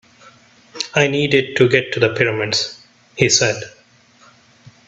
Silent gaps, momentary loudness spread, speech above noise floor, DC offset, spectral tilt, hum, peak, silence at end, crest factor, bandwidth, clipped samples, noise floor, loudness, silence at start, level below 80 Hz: none; 13 LU; 35 dB; under 0.1%; -3.5 dB/octave; none; 0 dBFS; 0.2 s; 20 dB; 8.4 kHz; under 0.1%; -51 dBFS; -16 LUFS; 0.25 s; -56 dBFS